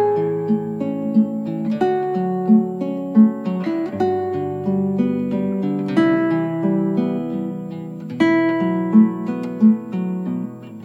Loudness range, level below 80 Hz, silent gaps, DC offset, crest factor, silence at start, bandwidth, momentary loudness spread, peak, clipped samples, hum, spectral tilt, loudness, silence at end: 1 LU; -68 dBFS; none; under 0.1%; 16 dB; 0 s; 7 kHz; 10 LU; -2 dBFS; under 0.1%; none; -9 dB/octave; -19 LUFS; 0 s